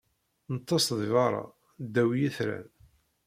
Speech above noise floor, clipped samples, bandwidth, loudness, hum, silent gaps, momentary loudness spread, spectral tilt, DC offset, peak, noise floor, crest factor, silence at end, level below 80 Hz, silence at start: 34 dB; under 0.1%; 16 kHz; -29 LUFS; none; none; 14 LU; -5 dB/octave; under 0.1%; -12 dBFS; -62 dBFS; 18 dB; 0.65 s; -68 dBFS; 0.5 s